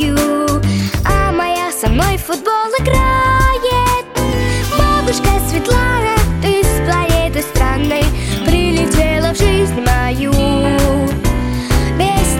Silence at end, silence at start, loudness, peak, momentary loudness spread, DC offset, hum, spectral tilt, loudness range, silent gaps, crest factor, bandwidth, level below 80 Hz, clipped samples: 0 s; 0 s; -14 LUFS; 0 dBFS; 3 LU; under 0.1%; none; -5 dB/octave; 1 LU; none; 12 dB; 17 kHz; -18 dBFS; under 0.1%